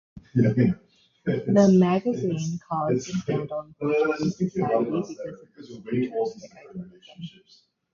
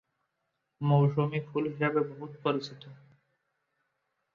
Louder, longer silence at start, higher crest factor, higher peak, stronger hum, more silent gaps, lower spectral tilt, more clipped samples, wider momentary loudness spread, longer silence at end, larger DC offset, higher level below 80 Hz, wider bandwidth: first, -25 LUFS vs -30 LUFS; second, 0.15 s vs 0.8 s; about the same, 18 dB vs 18 dB; first, -6 dBFS vs -14 dBFS; neither; neither; about the same, -7.5 dB/octave vs -8.5 dB/octave; neither; first, 22 LU vs 11 LU; second, 0.65 s vs 1.4 s; neither; first, -58 dBFS vs -72 dBFS; about the same, 7.4 kHz vs 7 kHz